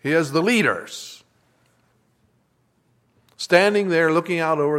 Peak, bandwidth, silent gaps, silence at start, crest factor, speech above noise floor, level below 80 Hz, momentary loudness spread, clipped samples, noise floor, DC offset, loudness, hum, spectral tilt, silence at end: 0 dBFS; 15.5 kHz; none; 0.05 s; 22 dB; 46 dB; -72 dBFS; 17 LU; under 0.1%; -65 dBFS; under 0.1%; -19 LUFS; none; -5 dB/octave; 0 s